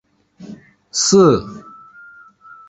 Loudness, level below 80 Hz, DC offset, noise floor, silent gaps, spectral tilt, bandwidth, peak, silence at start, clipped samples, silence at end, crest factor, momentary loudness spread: -14 LUFS; -50 dBFS; under 0.1%; -43 dBFS; none; -4.5 dB/octave; 8.2 kHz; -2 dBFS; 0.4 s; under 0.1%; 1.1 s; 18 dB; 27 LU